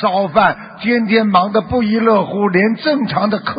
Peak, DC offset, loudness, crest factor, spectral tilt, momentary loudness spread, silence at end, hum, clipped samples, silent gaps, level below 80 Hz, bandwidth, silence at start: 0 dBFS; under 0.1%; -14 LUFS; 14 dB; -11.5 dB/octave; 4 LU; 0 s; none; under 0.1%; none; -44 dBFS; 5.2 kHz; 0 s